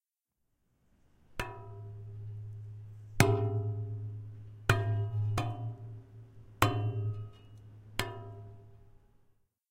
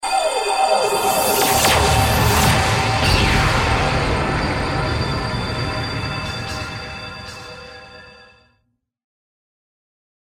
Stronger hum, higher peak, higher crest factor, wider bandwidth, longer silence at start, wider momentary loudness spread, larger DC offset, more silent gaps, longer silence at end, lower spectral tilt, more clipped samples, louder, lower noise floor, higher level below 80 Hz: neither; about the same, -4 dBFS vs -2 dBFS; first, 32 dB vs 18 dB; about the same, 16 kHz vs 16.5 kHz; first, 1.3 s vs 0 s; first, 21 LU vs 16 LU; neither; neither; second, 0.8 s vs 2.2 s; first, -5.5 dB/octave vs -4 dB/octave; neither; second, -34 LUFS vs -18 LUFS; first, -83 dBFS vs -68 dBFS; second, -54 dBFS vs -30 dBFS